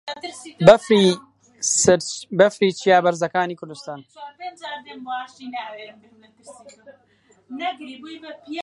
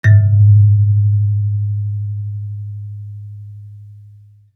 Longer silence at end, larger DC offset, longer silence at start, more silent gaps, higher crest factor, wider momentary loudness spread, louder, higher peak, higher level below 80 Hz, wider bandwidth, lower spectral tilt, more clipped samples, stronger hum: second, 0 s vs 0.55 s; neither; about the same, 0.05 s vs 0.05 s; neither; first, 22 dB vs 14 dB; about the same, 22 LU vs 23 LU; second, -18 LUFS vs -14 LUFS; about the same, 0 dBFS vs -2 dBFS; second, -58 dBFS vs -52 dBFS; first, 11.5 kHz vs 2.2 kHz; second, -4 dB/octave vs -9 dB/octave; neither; neither